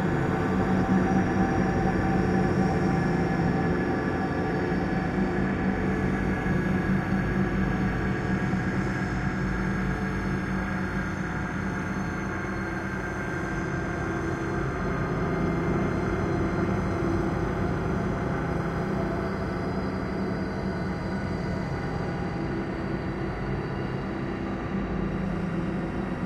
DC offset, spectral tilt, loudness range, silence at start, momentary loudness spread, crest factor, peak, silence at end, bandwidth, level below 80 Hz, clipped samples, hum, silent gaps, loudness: under 0.1%; -7.5 dB/octave; 5 LU; 0 s; 6 LU; 16 dB; -12 dBFS; 0 s; 10 kHz; -38 dBFS; under 0.1%; none; none; -28 LUFS